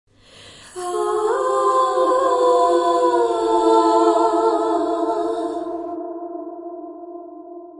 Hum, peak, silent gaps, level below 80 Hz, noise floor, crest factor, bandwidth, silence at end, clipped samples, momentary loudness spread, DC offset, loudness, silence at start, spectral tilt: 50 Hz at -60 dBFS; -4 dBFS; none; -60 dBFS; -45 dBFS; 16 dB; 11.5 kHz; 0 s; under 0.1%; 19 LU; under 0.1%; -18 LUFS; 0.4 s; -3.5 dB/octave